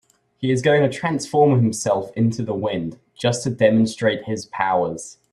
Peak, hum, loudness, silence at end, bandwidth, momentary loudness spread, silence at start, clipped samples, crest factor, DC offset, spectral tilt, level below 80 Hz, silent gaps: -2 dBFS; none; -20 LUFS; 0.2 s; 12.5 kHz; 10 LU; 0.4 s; under 0.1%; 18 dB; under 0.1%; -6 dB/octave; -58 dBFS; none